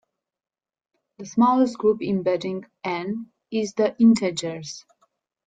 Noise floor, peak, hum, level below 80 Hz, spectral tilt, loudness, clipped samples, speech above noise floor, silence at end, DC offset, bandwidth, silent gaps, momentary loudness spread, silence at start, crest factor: under -90 dBFS; -6 dBFS; none; -66 dBFS; -5.5 dB/octave; -23 LUFS; under 0.1%; over 68 dB; 0.65 s; under 0.1%; 9.2 kHz; none; 16 LU; 1.2 s; 18 dB